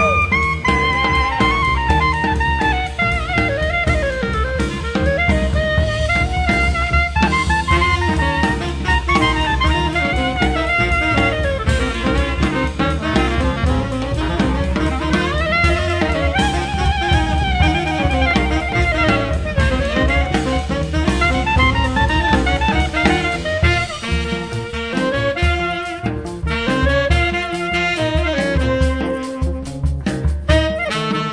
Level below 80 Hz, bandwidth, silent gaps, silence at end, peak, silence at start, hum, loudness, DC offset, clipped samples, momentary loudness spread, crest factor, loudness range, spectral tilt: -22 dBFS; 10.5 kHz; none; 0 s; 0 dBFS; 0 s; none; -17 LUFS; under 0.1%; under 0.1%; 5 LU; 16 dB; 2 LU; -5.5 dB/octave